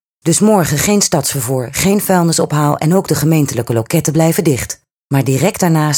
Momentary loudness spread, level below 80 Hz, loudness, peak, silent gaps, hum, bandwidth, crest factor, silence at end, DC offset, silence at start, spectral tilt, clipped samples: 6 LU; -44 dBFS; -13 LUFS; 0 dBFS; 4.92-5.10 s; none; 20 kHz; 14 dB; 0 s; under 0.1%; 0.25 s; -5 dB/octave; under 0.1%